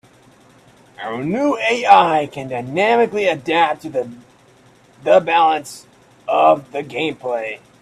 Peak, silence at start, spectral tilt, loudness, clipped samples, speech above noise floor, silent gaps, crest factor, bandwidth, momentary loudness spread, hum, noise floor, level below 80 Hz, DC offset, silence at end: 0 dBFS; 1 s; -5 dB/octave; -17 LUFS; under 0.1%; 33 dB; none; 18 dB; 13.5 kHz; 16 LU; none; -50 dBFS; -62 dBFS; under 0.1%; 0.25 s